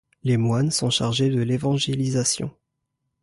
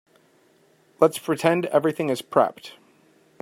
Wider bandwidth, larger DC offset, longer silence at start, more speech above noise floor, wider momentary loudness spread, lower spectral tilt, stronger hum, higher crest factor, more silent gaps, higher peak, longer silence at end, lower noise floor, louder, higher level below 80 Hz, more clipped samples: second, 11.5 kHz vs 16 kHz; neither; second, 0.25 s vs 1 s; first, 56 dB vs 38 dB; second, 3 LU vs 8 LU; about the same, -5 dB/octave vs -5.5 dB/octave; neither; second, 14 dB vs 22 dB; neither; second, -10 dBFS vs -4 dBFS; about the same, 0.7 s vs 0.7 s; first, -78 dBFS vs -60 dBFS; about the same, -22 LUFS vs -22 LUFS; first, -54 dBFS vs -72 dBFS; neither